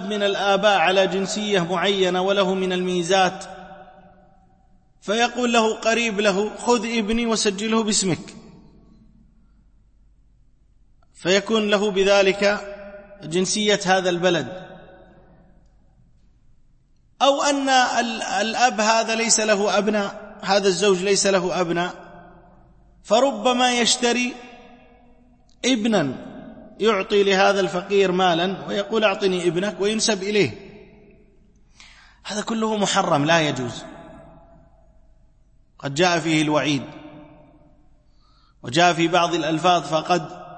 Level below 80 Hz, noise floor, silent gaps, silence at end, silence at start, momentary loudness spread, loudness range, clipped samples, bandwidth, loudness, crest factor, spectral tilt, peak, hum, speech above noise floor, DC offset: -54 dBFS; -56 dBFS; none; 0 s; 0 s; 12 LU; 6 LU; under 0.1%; 8.8 kHz; -20 LUFS; 18 dB; -3.5 dB/octave; -4 dBFS; none; 36 dB; under 0.1%